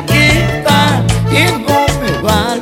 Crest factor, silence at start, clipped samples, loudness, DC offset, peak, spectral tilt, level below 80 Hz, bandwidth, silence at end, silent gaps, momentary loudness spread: 12 dB; 0 s; under 0.1%; -11 LUFS; under 0.1%; 0 dBFS; -5 dB/octave; -26 dBFS; 17 kHz; 0 s; none; 4 LU